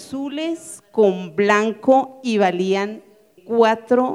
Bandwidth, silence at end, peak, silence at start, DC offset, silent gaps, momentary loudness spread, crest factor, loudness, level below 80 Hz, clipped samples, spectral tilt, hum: 12.5 kHz; 0 s; -2 dBFS; 0 s; under 0.1%; none; 10 LU; 18 dB; -19 LUFS; -70 dBFS; under 0.1%; -5.5 dB/octave; none